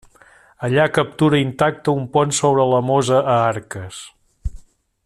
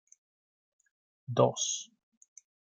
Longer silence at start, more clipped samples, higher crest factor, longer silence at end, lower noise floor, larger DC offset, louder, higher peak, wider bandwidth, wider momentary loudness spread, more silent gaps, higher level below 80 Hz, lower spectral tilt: second, 0.6 s vs 1.3 s; neither; second, 16 dB vs 26 dB; second, 0.45 s vs 0.95 s; second, -50 dBFS vs under -90 dBFS; neither; first, -17 LUFS vs -30 LUFS; first, -2 dBFS vs -10 dBFS; first, 13 kHz vs 10 kHz; second, 17 LU vs 23 LU; neither; first, -42 dBFS vs -78 dBFS; first, -5.5 dB/octave vs -4 dB/octave